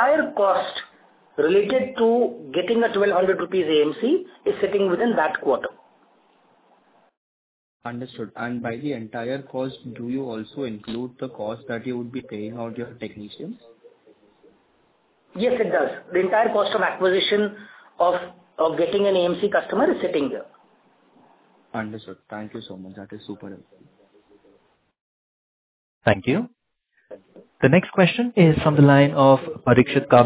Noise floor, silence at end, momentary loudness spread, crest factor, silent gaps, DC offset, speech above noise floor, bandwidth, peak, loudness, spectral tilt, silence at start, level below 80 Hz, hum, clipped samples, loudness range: -68 dBFS; 0 s; 19 LU; 22 dB; 7.17-7.80 s, 25.01-26.01 s; under 0.1%; 47 dB; 4 kHz; 0 dBFS; -21 LUFS; -10.5 dB/octave; 0 s; -56 dBFS; none; under 0.1%; 17 LU